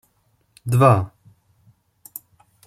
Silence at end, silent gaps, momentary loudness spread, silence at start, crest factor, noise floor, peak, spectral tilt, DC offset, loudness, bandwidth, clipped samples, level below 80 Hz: 1.6 s; none; 23 LU; 0.65 s; 20 dB; -65 dBFS; -2 dBFS; -7.5 dB/octave; under 0.1%; -17 LUFS; 16 kHz; under 0.1%; -56 dBFS